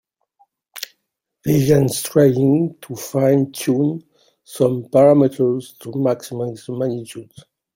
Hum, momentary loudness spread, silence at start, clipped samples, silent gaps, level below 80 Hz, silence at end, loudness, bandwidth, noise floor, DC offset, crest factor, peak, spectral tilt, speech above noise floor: none; 18 LU; 0.75 s; under 0.1%; none; -54 dBFS; 0.5 s; -18 LUFS; 17 kHz; -75 dBFS; under 0.1%; 16 dB; -2 dBFS; -7 dB/octave; 58 dB